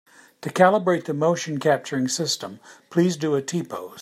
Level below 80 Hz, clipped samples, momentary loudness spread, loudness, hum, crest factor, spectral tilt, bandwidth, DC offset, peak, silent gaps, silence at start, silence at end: -70 dBFS; under 0.1%; 12 LU; -22 LUFS; none; 20 dB; -5 dB/octave; 15.5 kHz; under 0.1%; -4 dBFS; none; 0.4 s; 0 s